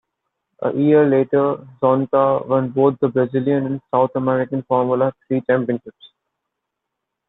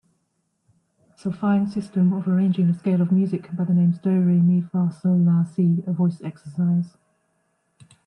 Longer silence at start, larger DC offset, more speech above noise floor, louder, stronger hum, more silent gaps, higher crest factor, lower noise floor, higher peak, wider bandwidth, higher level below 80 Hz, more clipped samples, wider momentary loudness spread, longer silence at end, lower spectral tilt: second, 0.6 s vs 1.25 s; neither; first, 62 dB vs 52 dB; first, -18 LUFS vs -21 LUFS; neither; neither; about the same, 16 dB vs 12 dB; first, -80 dBFS vs -72 dBFS; first, -4 dBFS vs -10 dBFS; second, 4 kHz vs 5.6 kHz; first, -62 dBFS vs -68 dBFS; neither; about the same, 7 LU vs 7 LU; about the same, 1.25 s vs 1.2 s; about the same, -11.5 dB/octave vs -10.5 dB/octave